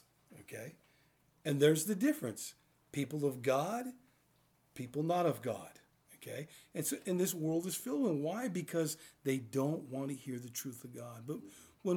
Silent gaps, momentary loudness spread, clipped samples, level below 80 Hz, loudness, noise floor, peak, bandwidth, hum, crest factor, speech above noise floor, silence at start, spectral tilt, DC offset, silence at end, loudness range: none; 15 LU; under 0.1%; -82 dBFS; -37 LUFS; -73 dBFS; -16 dBFS; over 20 kHz; none; 22 dB; 36 dB; 0.3 s; -5 dB/octave; under 0.1%; 0 s; 5 LU